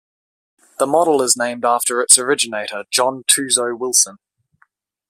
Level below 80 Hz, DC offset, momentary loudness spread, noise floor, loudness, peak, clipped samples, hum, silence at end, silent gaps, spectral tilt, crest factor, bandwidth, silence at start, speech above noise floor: -66 dBFS; under 0.1%; 9 LU; -60 dBFS; -15 LUFS; 0 dBFS; under 0.1%; none; 0.95 s; none; -0.5 dB/octave; 18 dB; 16 kHz; 0.8 s; 44 dB